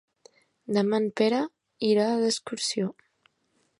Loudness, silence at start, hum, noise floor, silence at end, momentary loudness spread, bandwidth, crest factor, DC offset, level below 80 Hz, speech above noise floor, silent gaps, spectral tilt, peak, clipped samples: -26 LUFS; 0.7 s; none; -71 dBFS; 0.9 s; 9 LU; 11.5 kHz; 20 dB; under 0.1%; -76 dBFS; 46 dB; none; -4.5 dB/octave; -8 dBFS; under 0.1%